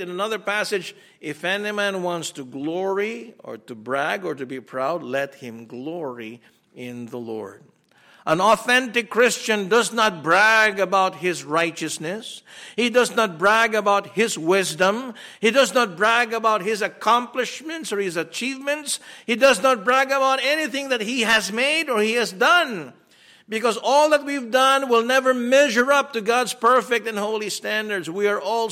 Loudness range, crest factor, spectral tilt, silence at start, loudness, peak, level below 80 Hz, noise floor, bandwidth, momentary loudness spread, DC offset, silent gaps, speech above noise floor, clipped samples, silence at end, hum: 9 LU; 16 dB; -3 dB/octave; 0 s; -20 LUFS; -6 dBFS; -68 dBFS; -54 dBFS; 16.5 kHz; 16 LU; under 0.1%; none; 33 dB; under 0.1%; 0 s; none